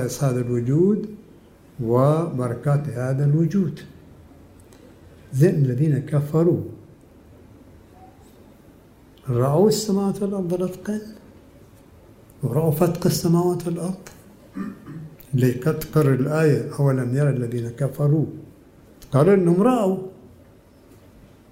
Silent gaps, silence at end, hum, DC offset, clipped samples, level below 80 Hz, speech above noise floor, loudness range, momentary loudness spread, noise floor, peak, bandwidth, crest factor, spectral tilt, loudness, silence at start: none; 1.25 s; none; under 0.1%; under 0.1%; -54 dBFS; 30 dB; 4 LU; 16 LU; -50 dBFS; -4 dBFS; 16 kHz; 18 dB; -7.5 dB/octave; -21 LUFS; 0 s